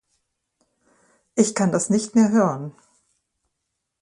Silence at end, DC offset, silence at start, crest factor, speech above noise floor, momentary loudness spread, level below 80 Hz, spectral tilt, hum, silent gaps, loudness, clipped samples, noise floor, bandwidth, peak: 1.3 s; under 0.1%; 1.35 s; 20 dB; 59 dB; 13 LU; -64 dBFS; -5.5 dB/octave; none; none; -20 LUFS; under 0.1%; -79 dBFS; 11 kHz; -4 dBFS